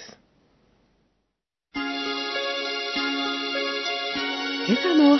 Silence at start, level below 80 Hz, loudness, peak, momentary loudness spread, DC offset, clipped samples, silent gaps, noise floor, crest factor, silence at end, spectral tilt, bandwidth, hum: 0 s; -66 dBFS; -25 LUFS; -8 dBFS; 7 LU; under 0.1%; under 0.1%; none; -80 dBFS; 18 dB; 0 s; -4 dB/octave; 6.2 kHz; none